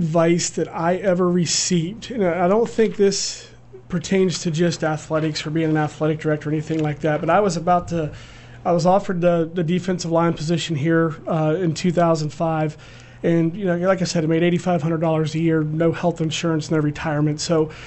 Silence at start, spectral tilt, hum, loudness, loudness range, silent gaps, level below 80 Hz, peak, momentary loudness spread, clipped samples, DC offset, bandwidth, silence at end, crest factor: 0 s; -5.5 dB/octave; none; -20 LUFS; 2 LU; none; -48 dBFS; -4 dBFS; 5 LU; under 0.1%; under 0.1%; 8.4 kHz; 0 s; 16 dB